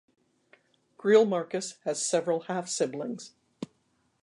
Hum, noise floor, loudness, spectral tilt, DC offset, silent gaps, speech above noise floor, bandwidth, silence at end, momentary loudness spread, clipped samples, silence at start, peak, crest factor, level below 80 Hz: none; -72 dBFS; -28 LUFS; -4 dB/octave; under 0.1%; none; 44 dB; 11 kHz; 0.6 s; 21 LU; under 0.1%; 1.05 s; -10 dBFS; 20 dB; -84 dBFS